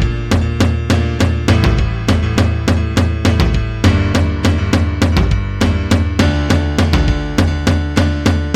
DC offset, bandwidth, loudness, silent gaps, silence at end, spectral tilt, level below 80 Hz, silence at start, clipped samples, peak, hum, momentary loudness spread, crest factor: under 0.1%; 13.5 kHz; -15 LUFS; none; 0 s; -6 dB/octave; -20 dBFS; 0 s; under 0.1%; 0 dBFS; none; 3 LU; 14 dB